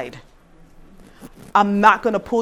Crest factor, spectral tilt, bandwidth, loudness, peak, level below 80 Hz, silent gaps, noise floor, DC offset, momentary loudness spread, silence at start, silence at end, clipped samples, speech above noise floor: 20 dB; -6 dB/octave; 13.5 kHz; -16 LUFS; 0 dBFS; -50 dBFS; none; -48 dBFS; under 0.1%; 8 LU; 0 s; 0 s; under 0.1%; 30 dB